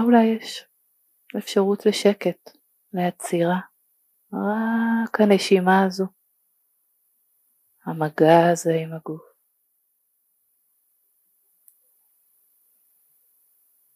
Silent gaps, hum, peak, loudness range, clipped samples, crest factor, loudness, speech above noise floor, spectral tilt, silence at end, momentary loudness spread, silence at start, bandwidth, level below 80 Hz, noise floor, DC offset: none; none; -2 dBFS; 3 LU; under 0.1%; 22 dB; -21 LUFS; 50 dB; -6 dB/octave; 4.75 s; 18 LU; 0 s; 15.5 kHz; -80 dBFS; -70 dBFS; under 0.1%